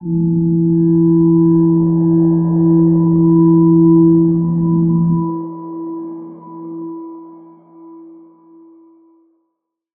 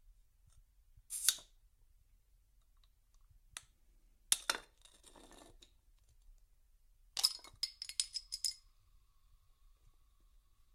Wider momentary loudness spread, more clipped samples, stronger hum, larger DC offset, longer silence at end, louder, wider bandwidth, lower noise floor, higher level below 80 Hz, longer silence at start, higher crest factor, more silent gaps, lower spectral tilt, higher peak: about the same, 19 LU vs 19 LU; neither; neither; neither; second, 1.95 s vs 2.2 s; first, -12 LUFS vs -37 LUFS; second, 1.6 kHz vs 16 kHz; about the same, -73 dBFS vs -70 dBFS; first, -46 dBFS vs -68 dBFS; about the same, 0 s vs 0.1 s; second, 12 dB vs 38 dB; neither; first, -16.5 dB/octave vs 2 dB/octave; first, -2 dBFS vs -8 dBFS